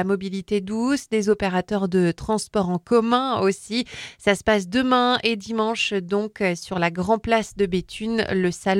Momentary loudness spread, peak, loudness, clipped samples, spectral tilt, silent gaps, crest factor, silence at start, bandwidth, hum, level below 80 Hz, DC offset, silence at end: 7 LU; -2 dBFS; -22 LUFS; under 0.1%; -5 dB/octave; none; 20 dB; 0 s; 14.5 kHz; none; -50 dBFS; under 0.1%; 0 s